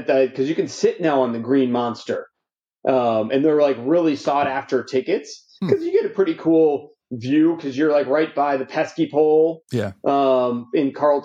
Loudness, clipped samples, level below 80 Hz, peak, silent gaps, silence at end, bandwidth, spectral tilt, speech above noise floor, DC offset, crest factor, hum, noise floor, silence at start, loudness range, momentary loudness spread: -20 LUFS; under 0.1%; -70 dBFS; -4 dBFS; none; 0 s; 7.8 kHz; -6.5 dB/octave; 64 dB; under 0.1%; 16 dB; none; -83 dBFS; 0 s; 1 LU; 9 LU